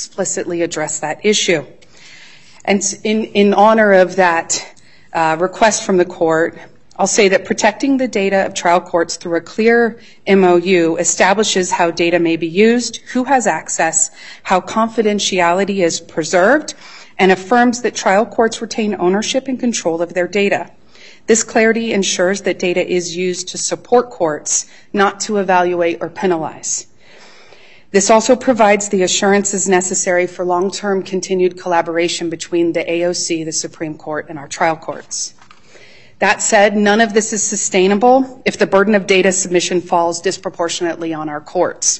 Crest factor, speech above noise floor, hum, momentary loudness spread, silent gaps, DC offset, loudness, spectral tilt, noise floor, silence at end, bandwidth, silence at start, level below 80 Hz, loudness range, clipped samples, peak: 16 dB; 30 dB; none; 9 LU; none; 0.7%; -15 LUFS; -3.5 dB/octave; -45 dBFS; 0 s; 8.6 kHz; 0 s; -56 dBFS; 4 LU; under 0.1%; 0 dBFS